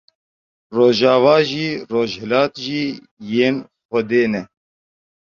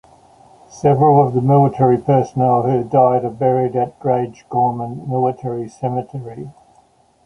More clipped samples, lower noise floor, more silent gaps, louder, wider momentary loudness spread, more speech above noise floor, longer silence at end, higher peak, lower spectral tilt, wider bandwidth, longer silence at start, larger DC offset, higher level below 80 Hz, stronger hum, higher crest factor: neither; first, under -90 dBFS vs -54 dBFS; first, 3.11-3.17 s, 3.85-3.89 s vs none; about the same, -18 LUFS vs -16 LUFS; about the same, 13 LU vs 13 LU; first, over 73 dB vs 38 dB; about the same, 0.85 s vs 0.75 s; about the same, -2 dBFS vs -2 dBFS; second, -6 dB/octave vs -9.5 dB/octave; second, 7.2 kHz vs 8.2 kHz; about the same, 0.7 s vs 0.75 s; neither; second, -60 dBFS vs -54 dBFS; neither; about the same, 18 dB vs 16 dB